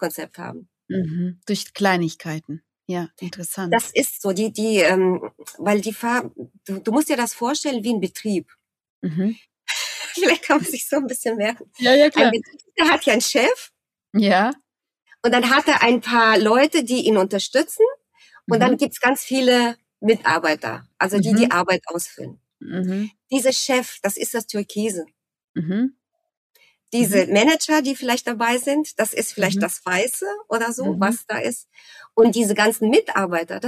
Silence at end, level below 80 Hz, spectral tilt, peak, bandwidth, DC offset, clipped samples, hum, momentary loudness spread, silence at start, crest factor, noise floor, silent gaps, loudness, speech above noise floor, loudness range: 0 s; -66 dBFS; -4 dB/octave; -2 dBFS; 15.5 kHz; under 0.1%; under 0.1%; none; 13 LU; 0 s; 18 dB; -42 dBFS; 8.90-9.02 s, 25.44-25.54 s, 26.37-26.50 s; -20 LUFS; 22 dB; 6 LU